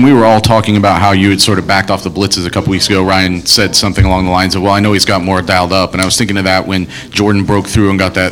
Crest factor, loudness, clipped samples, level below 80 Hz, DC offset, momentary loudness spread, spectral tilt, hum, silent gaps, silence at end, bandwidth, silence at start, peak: 10 dB; -10 LUFS; 0.6%; -28 dBFS; under 0.1%; 5 LU; -4.5 dB/octave; none; none; 0 s; over 20 kHz; 0 s; 0 dBFS